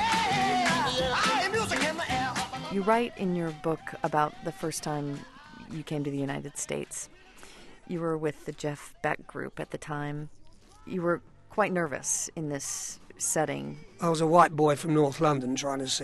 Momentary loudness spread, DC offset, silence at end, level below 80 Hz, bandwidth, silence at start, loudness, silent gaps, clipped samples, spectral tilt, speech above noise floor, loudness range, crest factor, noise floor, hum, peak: 13 LU; under 0.1%; 0 s; -56 dBFS; 12.5 kHz; 0 s; -29 LUFS; none; under 0.1%; -4 dB/octave; 21 dB; 8 LU; 22 dB; -51 dBFS; none; -6 dBFS